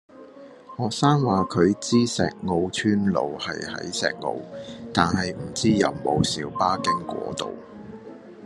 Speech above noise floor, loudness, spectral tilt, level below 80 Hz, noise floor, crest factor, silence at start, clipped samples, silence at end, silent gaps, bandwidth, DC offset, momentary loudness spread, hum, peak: 21 dB; -24 LUFS; -5 dB/octave; -56 dBFS; -45 dBFS; 22 dB; 0.15 s; under 0.1%; 0 s; none; 12 kHz; under 0.1%; 17 LU; none; -2 dBFS